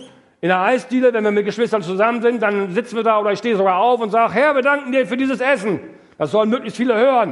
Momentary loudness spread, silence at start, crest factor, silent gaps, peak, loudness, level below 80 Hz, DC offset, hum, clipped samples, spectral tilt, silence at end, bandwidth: 5 LU; 0 s; 16 dB; none; -2 dBFS; -17 LUFS; -68 dBFS; under 0.1%; none; under 0.1%; -6 dB/octave; 0 s; 11.5 kHz